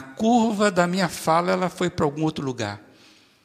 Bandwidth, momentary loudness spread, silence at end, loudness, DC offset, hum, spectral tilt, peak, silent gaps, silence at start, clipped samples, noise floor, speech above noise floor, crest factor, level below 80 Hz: 15.5 kHz; 9 LU; 0.65 s; -23 LUFS; under 0.1%; none; -5.5 dB/octave; -4 dBFS; none; 0 s; under 0.1%; -54 dBFS; 32 dB; 18 dB; -58 dBFS